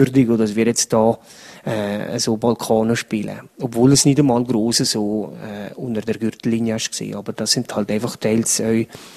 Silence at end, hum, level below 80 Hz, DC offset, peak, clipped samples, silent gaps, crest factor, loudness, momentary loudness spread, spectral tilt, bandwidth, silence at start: 0 s; none; -54 dBFS; under 0.1%; 0 dBFS; under 0.1%; none; 18 dB; -19 LUFS; 12 LU; -4.5 dB/octave; 14.5 kHz; 0 s